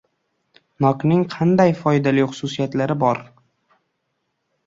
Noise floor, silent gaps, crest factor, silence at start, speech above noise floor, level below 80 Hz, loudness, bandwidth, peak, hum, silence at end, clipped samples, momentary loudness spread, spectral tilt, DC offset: -73 dBFS; none; 18 dB; 0.8 s; 55 dB; -58 dBFS; -19 LUFS; 7.8 kHz; -2 dBFS; none; 1.45 s; under 0.1%; 7 LU; -7.5 dB/octave; under 0.1%